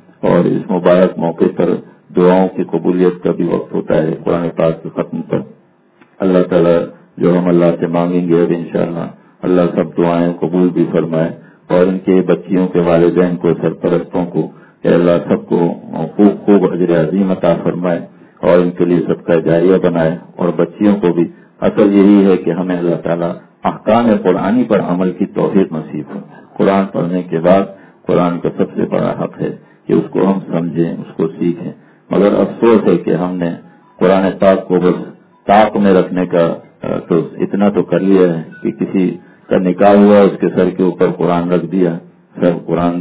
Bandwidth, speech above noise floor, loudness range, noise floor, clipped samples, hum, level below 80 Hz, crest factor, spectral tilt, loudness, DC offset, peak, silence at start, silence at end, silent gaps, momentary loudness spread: 4 kHz; 37 dB; 4 LU; -49 dBFS; 0.2%; none; -48 dBFS; 14 dB; -12 dB/octave; -13 LUFS; under 0.1%; 0 dBFS; 0.25 s; 0 s; none; 10 LU